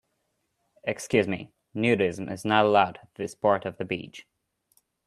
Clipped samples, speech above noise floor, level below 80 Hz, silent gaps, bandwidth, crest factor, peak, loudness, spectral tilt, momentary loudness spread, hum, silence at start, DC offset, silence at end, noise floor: under 0.1%; 51 dB; -66 dBFS; none; 13.5 kHz; 22 dB; -6 dBFS; -26 LUFS; -5.5 dB/octave; 14 LU; none; 0.85 s; under 0.1%; 0.85 s; -76 dBFS